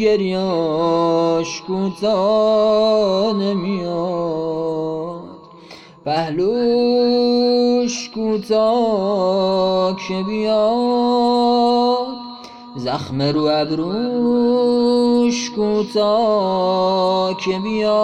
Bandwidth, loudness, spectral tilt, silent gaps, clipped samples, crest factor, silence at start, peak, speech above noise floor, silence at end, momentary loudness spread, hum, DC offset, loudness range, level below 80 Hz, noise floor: 10.5 kHz; -17 LUFS; -6 dB/octave; none; under 0.1%; 12 dB; 0 s; -6 dBFS; 24 dB; 0 s; 8 LU; none; under 0.1%; 3 LU; -54 dBFS; -41 dBFS